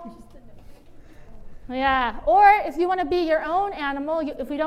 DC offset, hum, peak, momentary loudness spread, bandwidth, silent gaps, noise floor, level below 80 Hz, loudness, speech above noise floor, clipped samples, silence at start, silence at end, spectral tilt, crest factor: under 0.1%; none; -4 dBFS; 12 LU; 13 kHz; none; -44 dBFS; -44 dBFS; -21 LUFS; 23 dB; under 0.1%; 0 s; 0 s; -5.5 dB/octave; 20 dB